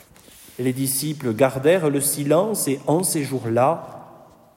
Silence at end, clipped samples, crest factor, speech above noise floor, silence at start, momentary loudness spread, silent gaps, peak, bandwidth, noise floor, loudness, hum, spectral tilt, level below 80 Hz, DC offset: 0.4 s; under 0.1%; 18 dB; 27 dB; 0.45 s; 8 LU; none; -4 dBFS; 16.5 kHz; -48 dBFS; -21 LUFS; none; -4.5 dB/octave; -62 dBFS; under 0.1%